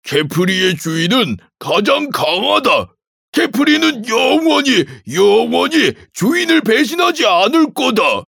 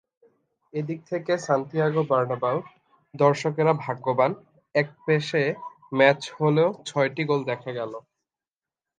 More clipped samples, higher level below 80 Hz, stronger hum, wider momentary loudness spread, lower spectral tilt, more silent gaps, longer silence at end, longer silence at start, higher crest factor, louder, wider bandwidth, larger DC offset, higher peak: neither; first, -60 dBFS vs -74 dBFS; neither; second, 5 LU vs 11 LU; second, -4 dB/octave vs -6.5 dB/octave; first, 3.07-3.33 s vs none; second, 0.05 s vs 1 s; second, 0.05 s vs 0.75 s; second, 14 dB vs 22 dB; first, -13 LUFS vs -24 LUFS; first, 18 kHz vs 9.6 kHz; neither; first, 0 dBFS vs -4 dBFS